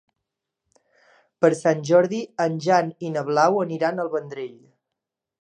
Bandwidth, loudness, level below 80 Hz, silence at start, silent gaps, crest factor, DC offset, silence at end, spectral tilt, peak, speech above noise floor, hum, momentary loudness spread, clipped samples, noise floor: 10 kHz; -22 LUFS; -78 dBFS; 1.4 s; none; 20 dB; under 0.1%; 0.95 s; -6 dB/octave; -4 dBFS; 63 dB; none; 10 LU; under 0.1%; -85 dBFS